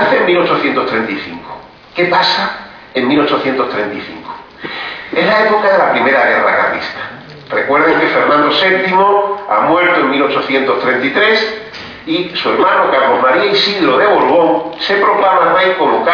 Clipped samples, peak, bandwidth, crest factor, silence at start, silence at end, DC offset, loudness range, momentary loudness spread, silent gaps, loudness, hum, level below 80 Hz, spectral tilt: under 0.1%; 0 dBFS; 5.4 kHz; 12 dB; 0 s; 0 s; under 0.1%; 4 LU; 15 LU; none; -12 LUFS; none; -54 dBFS; -5.5 dB/octave